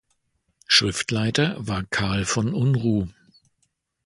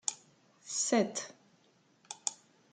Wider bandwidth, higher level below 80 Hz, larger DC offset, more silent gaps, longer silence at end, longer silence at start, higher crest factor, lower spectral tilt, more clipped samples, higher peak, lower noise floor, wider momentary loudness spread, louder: first, 11.5 kHz vs 9.8 kHz; first, -46 dBFS vs -84 dBFS; neither; neither; first, 0.95 s vs 0.4 s; first, 0.7 s vs 0.05 s; about the same, 22 dB vs 26 dB; first, -4 dB/octave vs -2.5 dB/octave; neither; first, -2 dBFS vs -12 dBFS; first, -72 dBFS vs -68 dBFS; second, 8 LU vs 21 LU; first, -22 LUFS vs -34 LUFS